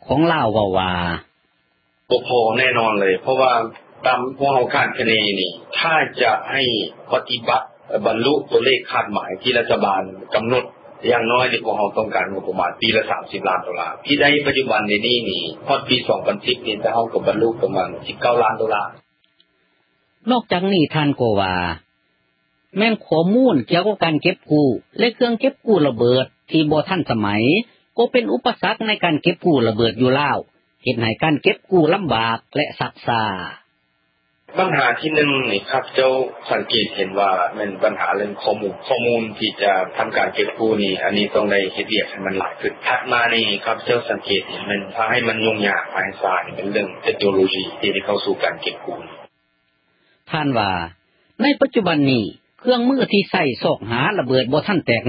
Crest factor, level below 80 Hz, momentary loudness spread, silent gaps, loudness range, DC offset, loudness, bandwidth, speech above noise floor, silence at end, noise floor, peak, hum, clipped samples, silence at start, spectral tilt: 18 dB; -52 dBFS; 7 LU; none; 3 LU; under 0.1%; -19 LUFS; 5.2 kHz; 47 dB; 0 s; -66 dBFS; 0 dBFS; none; under 0.1%; 0.05 s; -10.5 dB/octave